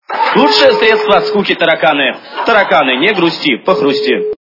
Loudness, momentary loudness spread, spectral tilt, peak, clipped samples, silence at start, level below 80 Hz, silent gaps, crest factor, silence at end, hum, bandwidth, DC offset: -10 LUFS; 6 LU; -5 dB/octave; 0 dBFS; 0.3%; 0.1 s; -52 dBFS; none; 10 dB; 0.05 s; none; 6 kHz; under 0.1%